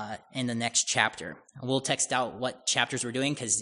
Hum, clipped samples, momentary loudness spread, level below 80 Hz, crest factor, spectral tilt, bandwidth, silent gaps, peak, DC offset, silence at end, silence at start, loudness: none; under 0.1%; 11 LU; -70 dBFS; 24 dB; -2 dB/octave; 11 kHz; none; -6 dBFS; under 0.1%; 0 s; 0 s; -28 LUFS